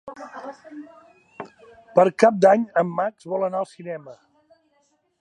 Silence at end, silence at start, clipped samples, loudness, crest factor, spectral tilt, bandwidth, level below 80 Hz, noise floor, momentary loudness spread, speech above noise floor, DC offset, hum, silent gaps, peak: 1.05 s; 0.05 s; under 0.1%; -20 LUFS; 22 dB; -6.5 dB/octave; 11 kHz; -74 dBFS; -67 dBFS; 25 LU; 45 dB; under 0.1%; none; none; -2 dBFS